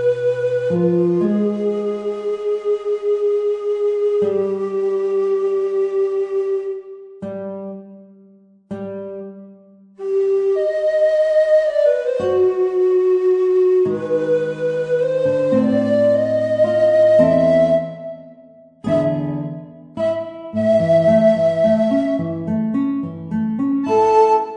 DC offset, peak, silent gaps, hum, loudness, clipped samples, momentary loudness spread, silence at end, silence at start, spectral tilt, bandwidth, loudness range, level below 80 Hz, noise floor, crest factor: under 0.1%; -2 dBFS; none; none; -17 LUFS; under 0.1%; 15 LU; 0 s; 0 s; -8 dB/octave; 9.4 kHz; 8 LU; -56 dBFS; -49 dBFS; 16 dB